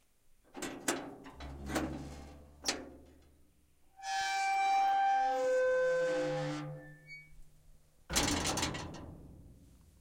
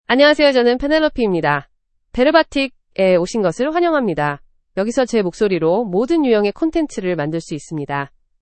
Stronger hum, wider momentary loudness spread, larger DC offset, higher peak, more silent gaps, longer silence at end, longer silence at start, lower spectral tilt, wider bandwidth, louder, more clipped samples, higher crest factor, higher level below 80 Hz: neither; first, 21 LU vs 11 LU; neither; second, -16 dBFS vs 0 dBFS; neither; about the same, 0.35 s vs 0.35 s; first, 0.55 s vs 0.1 s; second, -3 dB/octave vs -5.5 dB/octave; first, 16 kHz vs 8.8 kHz; second, -34 LUFS vs -17 LUFS; neither; about the same, 20 dB vs 16 dB; second, -54 dBFS vs -44 dBFS